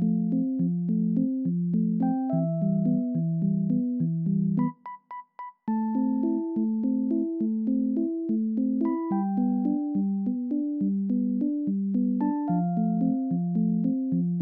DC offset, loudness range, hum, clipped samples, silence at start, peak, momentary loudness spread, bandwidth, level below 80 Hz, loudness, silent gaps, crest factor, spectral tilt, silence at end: under 0.1%; 2 LU; none; under 0.1%; 0 s; -14 dBFS; 3 LU; 2.1 kHz; -72 dBFS; -27 LUFS; none; 12 dB; -13.5 dB/octave; 0 s